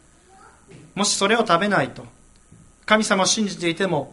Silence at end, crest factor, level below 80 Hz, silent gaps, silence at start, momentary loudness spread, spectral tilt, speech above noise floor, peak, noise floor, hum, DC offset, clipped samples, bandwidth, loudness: 0.05 s; 20 dB; -58 dBFS; none; 0.75 s; 9 LU; -3 dB/octave; 30 dB; -2 dBFS; -50 dBFS; none; under 0.1%; under 0.1%; 11.5 kHz; -20 LUFS